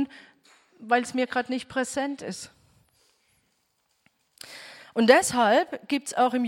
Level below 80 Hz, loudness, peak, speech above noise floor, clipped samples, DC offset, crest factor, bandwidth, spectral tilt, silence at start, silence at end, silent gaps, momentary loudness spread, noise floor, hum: -68 dBFS; -25 LUFS; -4 dBFS; 48 dB; under 0.1%; under 0.1%; 24 dB; 16.5 kHz; -3 dB/octave; 0 s; 0 s; none; 23 LU; -72 dBFS; none